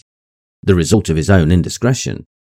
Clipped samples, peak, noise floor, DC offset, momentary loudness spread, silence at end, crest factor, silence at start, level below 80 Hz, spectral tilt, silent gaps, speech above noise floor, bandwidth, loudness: 0.1%; 0 dBFS; under -90 dBFS; under 0.1%; 11 LU; 0.3 s; 16 dB; 0.65 s; -36 dBFS; -6 dB/octave; none; over 77 dB; 15 kHz; -15 LUFS